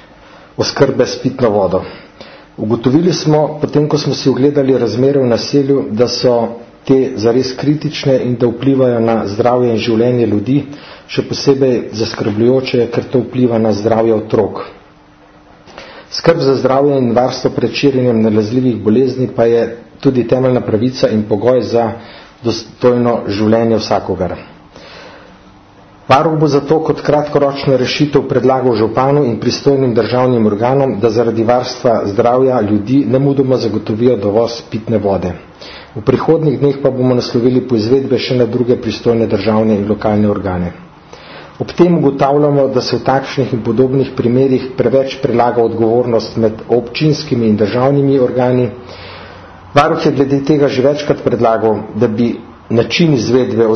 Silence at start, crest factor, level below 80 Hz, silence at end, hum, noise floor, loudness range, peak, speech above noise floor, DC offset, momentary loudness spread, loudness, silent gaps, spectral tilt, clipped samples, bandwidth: 0.6 s; 12 dB; -46 dBFS; 0 s; none; -43 dBFS; 3 LU; 0 dBFS; 31 dB; under 0.1%; 8 LU; -13 LUFS; none; -7 dB/octave; under 0.1%; 6.6 kHz